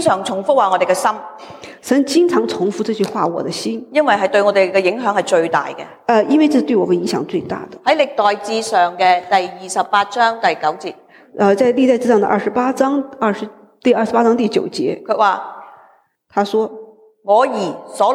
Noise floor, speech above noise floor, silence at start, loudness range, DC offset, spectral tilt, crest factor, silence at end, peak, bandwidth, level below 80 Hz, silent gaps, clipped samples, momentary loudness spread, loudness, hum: -52 dBFS; 37 dB; 0 s; 3 LU; under 0.1%; -4.5 dB/octave; 14 dB; 0 s; -2 dBFS; 16 kHz; -66 dBFS; none; under 0.1%; 11 LU; -16 LUFS; none